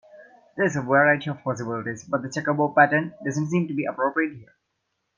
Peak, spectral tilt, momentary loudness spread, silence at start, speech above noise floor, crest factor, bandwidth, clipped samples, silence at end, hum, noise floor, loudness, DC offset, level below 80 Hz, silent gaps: -4 dBFS; -6.5 dB/octave; 11 LU; 0.15 s; 53 dB; 20 dB; 9.6 kHz; under 0.1%; 0.75 s; none; -77 dBFS; -23 LUFS; under 0.1%; -68 dBFS; none